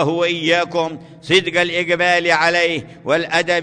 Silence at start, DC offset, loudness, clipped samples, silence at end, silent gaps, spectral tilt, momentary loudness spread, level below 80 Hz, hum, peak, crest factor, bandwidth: 0 s; under 0.1%; -16 LUFS; under 0.1%; 0 s; none; -4 dB/octave; 8 LU; -58 dBFS; none; -2 dBFS; 14 dB; 10.5 kHz